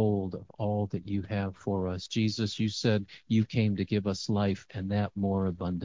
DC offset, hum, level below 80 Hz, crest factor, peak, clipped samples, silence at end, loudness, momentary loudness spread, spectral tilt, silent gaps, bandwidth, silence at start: under 0.1%; none; -50 dBFS; 16 dB; -14 dBFS; under 0.1%; 0 s; -31 LUFS; 5 LU; -6.5 dB/octave; none; 7.6 kHz; 0 s